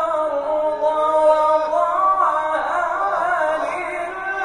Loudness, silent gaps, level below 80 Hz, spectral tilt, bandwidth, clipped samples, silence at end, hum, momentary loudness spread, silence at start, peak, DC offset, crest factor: -19 LUFS; none; -54 dBFS; -3.5 dB/octave; 11 kHz; under 0.1%; 0 s; none; 8 LU; 0 s; -4 dBFS; under 0.1%; 14 dB